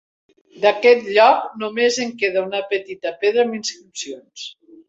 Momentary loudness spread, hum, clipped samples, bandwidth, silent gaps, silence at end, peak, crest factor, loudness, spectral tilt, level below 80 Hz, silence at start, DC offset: 18 LU; none; under 0.1%; 8 kHz; none; 0.35 s; -2 dBFS; 18 dB; -18 LUFS; -2.5 dB/octave; -70 dBFS; 0.55 s; under 0.1%